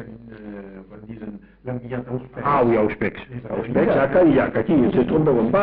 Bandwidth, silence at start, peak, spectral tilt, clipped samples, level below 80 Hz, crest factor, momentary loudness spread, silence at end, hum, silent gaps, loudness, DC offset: 4.9 kHz; 0 s; -8 dBFS; -7 dB/octave; under 0.1%; -46 dBFS; 12 dB; 21 LU; 0 s; none; none; -20 LUFS; under 0.1%